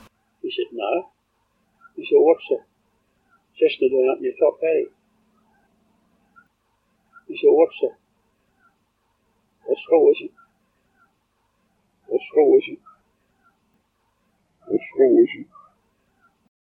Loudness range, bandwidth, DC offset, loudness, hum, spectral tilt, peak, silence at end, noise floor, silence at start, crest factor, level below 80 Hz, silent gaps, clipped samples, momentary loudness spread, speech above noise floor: 3 LU; 4.6 kHz; under 0.1%; -20 LUFS; none; -7.5 dB/octave; -4 dBFS; 1.25 s; -69 dBFS; 0.45 s; 20 dB; -74 dBFS; none; under 0.1%; 19 LU; 50 dB